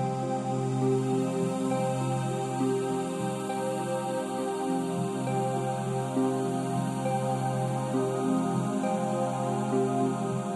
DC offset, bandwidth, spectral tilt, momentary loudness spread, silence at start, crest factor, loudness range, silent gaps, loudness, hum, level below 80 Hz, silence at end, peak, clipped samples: under 0.1%; 12.5 kHz; -6.5 dB/octave; 3 LU; 0 s; 12 dB; 2 LU; none; -29 LUFS; none; -68 dBFS; 0 s; -16 dBFS; under 0.1%